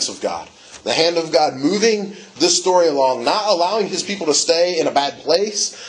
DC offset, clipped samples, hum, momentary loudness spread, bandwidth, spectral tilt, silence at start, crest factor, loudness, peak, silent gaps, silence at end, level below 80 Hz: under 0.1%; under 0.1%; none; 10 LU; 11 kHz; -2.5 dB/octave; 0 s; 18 dB; -17 LUFS; 0 dBFS; none; 0 s; -66 dBFS